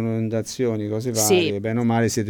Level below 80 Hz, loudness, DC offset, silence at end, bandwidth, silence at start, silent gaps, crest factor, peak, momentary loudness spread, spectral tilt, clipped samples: -58 dBFS; -21 LUFS; under 0.1%; 0 s; over 20 kHz; 0 s; none; 16 dB; -6 dBFS; 7 LU; -4.5 dB/octave; under 0.1%